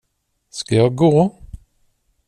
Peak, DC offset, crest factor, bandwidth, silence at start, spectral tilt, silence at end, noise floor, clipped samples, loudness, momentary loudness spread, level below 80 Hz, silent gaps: -4 dBFS; under 0.1%; 16 dB; 10.5 kHz; 0.55 s; -7 dB/octave; 0.7 s; -70 dBFS; under 0.1%; -16 LUFS; 16 LU; -46 dBFS; none